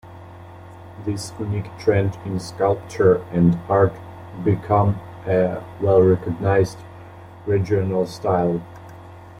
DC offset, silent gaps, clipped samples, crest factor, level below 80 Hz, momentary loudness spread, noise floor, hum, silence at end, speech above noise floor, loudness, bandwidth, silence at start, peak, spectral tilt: under 0.1%; none; under 0.1%; 18 dB; -50 dBFS; 23 LU; -40 dBFS; none; 0 s; 21 dB; -21 LUFS; 11.5 kHz; 0.05 s; -4 dBFS; -8 dB/octave